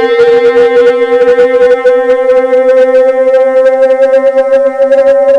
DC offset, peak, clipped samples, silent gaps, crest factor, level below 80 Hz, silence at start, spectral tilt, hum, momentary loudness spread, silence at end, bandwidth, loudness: under 0.1%; 0 dBFS; under 0.1%; none; 6 dB; -48 dBFS; 0 s; -4.5 dB/octave; none; 2 LU; 0 s; 8.2 kHz; -6 LUFS